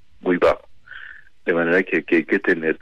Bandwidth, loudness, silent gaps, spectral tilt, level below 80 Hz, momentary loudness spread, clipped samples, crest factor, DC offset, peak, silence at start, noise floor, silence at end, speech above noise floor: 8.4 kHz; -20 LUFS; none; -7 dB/octave; -52 dBFS; 20 LU; under 0.1%; 14 dB; 0.6%; -8 dBFS; 0.25 s; -42 dBFS; 0.05 s; 23 dB